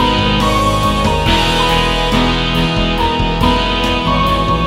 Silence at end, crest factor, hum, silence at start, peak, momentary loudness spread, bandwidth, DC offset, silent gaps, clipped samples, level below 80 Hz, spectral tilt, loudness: 0 s; 12 dB; none; 0 s; 0 dBFS; 2 LU; 16 kHz; 0.2%; none; under 0.1%; -22 dBFS; -5 dB/octave; -13 LUFS